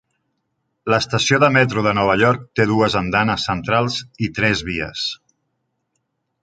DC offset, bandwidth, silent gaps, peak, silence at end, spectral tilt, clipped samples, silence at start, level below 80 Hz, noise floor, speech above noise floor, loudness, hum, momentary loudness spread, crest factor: under 0.1%; 9.2 kHz; none; -2 dBFS; 1.25 s; -5 dB/octave; under 0.1%; 0.85 s; -46 dBFS; -73 dBFS; 55 dB; -18 LUFS; none; 10 LU; 18 dB